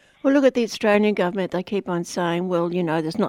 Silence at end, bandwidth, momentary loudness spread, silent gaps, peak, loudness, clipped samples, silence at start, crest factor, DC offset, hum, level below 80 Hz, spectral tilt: 0 s; 16 kHz; 7 LU; none; -4 dBFS; -22 LUFS; under 0.1%; 0.25 s; 18 dB; under 0.1%; none; -64 dBFS; -6 dB/octave